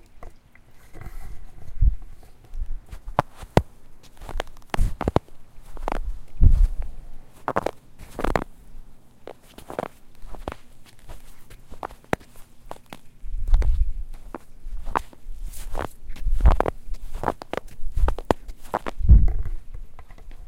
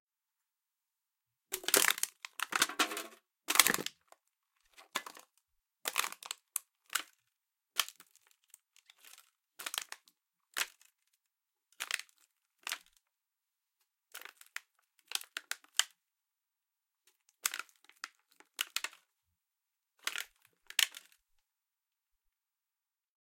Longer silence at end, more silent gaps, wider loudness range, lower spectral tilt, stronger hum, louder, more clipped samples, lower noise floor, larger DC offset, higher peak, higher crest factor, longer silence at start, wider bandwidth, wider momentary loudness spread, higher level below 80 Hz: second, 0 s vs 2.25 s; neither; about the same, 11 LU vs 13 LU; first, -7 dB/octave vs 1 dB/octave; neither; first, -27 LUFS vs -35 LUFS; neither; second, -46 dBFS vs under -90 dBFS; neither; about the same, 0 dBFS vs -2 dBFS; second, 24 dB vs 40 dB; second, 0.15 s vs 1.5 s; second, 12.5 kHz vs 17 kHz; about the same, 24 LU vs 22 LU; first, -26 dBFS vs -86 dBFS